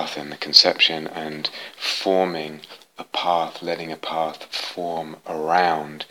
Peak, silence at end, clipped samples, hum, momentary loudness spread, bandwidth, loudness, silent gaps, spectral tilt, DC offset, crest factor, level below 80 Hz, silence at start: 0 dBFS; 0.05 s; under 0.1%; none; 16 LU; 19 kHz; -21 LUFS; none; -2.5 dB/octave; under 0.1%; 24 dB; -74 dBFS; 0 s